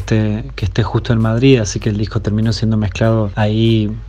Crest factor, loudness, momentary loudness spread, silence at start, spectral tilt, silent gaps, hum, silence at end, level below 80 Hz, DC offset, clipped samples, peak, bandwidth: 14 dB; -15 LUFS; 7 LU; 0 s; -6.5 dB/octave; none; none; 0 s; -30 dBFS; under 0.1%; under 0.1%; 0 dBFS; 8.2 kHz